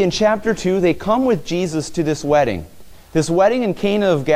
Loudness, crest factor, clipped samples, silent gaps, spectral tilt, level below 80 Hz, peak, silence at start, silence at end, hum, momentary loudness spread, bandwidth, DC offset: -18 LUFS; 14 dB; under 0.1%; none; -5.5 dB/octave; -42 dBFS; -4 dBFS; 0 s; 0 s; none; 6 LU; 16 kHz; under 0.1%